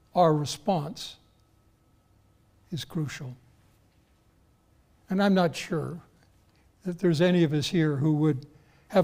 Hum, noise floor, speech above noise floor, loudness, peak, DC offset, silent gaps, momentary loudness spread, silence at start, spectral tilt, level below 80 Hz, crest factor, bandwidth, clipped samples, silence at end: none; -64 dBFS; 38 dB; -27 LUFS; -10 dBFS; under 0.1%; none; 16 LU; 0.15 s; -6.5 dB/octave; -62 dBFS; 18 dB; 16 kHz; under 0.1%; 0 s